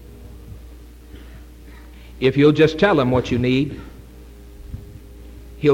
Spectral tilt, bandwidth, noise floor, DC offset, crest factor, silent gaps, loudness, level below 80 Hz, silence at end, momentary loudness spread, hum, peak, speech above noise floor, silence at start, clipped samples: -7.5 dB/octave; 16.5 kHz; -40 dBFS; under 0.1%; 18 dB; none; -17 LUFS; -40 dBFS; 0 s; 26 LU; none; -4 dBFS; 24 dB; 0.1 s; under 0.1%